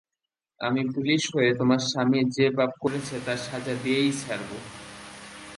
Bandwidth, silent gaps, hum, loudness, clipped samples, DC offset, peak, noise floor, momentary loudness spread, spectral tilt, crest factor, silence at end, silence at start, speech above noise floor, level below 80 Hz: 11.5 kHz; none; none; -25 LUFS; under 0.1%; under 0.1%; -8 dBFS; -87 dBFS; 18 LU; -5 dB/octave; 18 dB; 0 s; 0.6 s; 62 dB; -62 dBFS